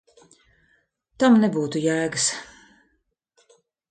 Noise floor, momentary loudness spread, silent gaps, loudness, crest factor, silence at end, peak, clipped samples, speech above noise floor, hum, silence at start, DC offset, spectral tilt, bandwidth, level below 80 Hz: -72 dBFS; 7 LU; none; -21 LUFS; 18 dB; 1.45 s; -8 dBFS; under 0.1%; 52 dB; none; 1.2 s; under 0.1%; -4 dB/octave; 9.4 kHz; -66 dBFS